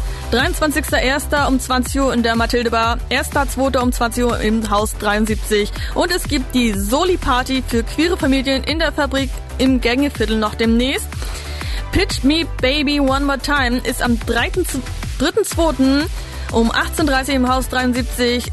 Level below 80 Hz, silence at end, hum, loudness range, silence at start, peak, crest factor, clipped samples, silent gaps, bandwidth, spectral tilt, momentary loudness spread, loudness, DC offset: -26 dBFS; 0 s; none; 1 LU; 0 s; -6 dBFS; 12 dB; under 0.1%; none; 12.5 kHz; -4.5 dB/octave; 5 LU; -17 LUFS; under 0.1%